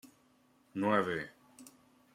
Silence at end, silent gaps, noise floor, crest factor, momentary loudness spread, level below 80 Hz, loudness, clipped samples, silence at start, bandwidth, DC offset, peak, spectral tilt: 0.45 s; none; -69 dBFS; 22 dB; 25 LU; -76 dBFS; -34 LUFS; under 0.1%; 0.05 s; 16 kHz; under 0.1%; -16 dBFS; -6 dB/octave